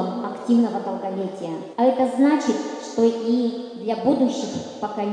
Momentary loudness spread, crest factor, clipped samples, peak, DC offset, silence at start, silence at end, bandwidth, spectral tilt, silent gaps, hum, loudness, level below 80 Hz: 11 LU; 16 dB; under 0.1%; -6 dBFS; under 0.1%; 0 s; 0 s; 10 kHz; -6 dB/octave; none; none; -22 LUFS; -70 dBFS